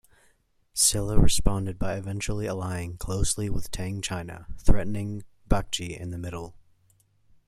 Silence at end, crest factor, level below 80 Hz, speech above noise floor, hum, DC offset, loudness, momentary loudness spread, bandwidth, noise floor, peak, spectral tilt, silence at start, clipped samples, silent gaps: 0.95 s; 22 dB; -32 dBFS; 41 dB; none; under 0.1%; -28 LUFS; 13 LU; 14 kHz; -65 dBFS; -4 dBFS; -4 dB/octave; 0.75 s; under 0.1%; none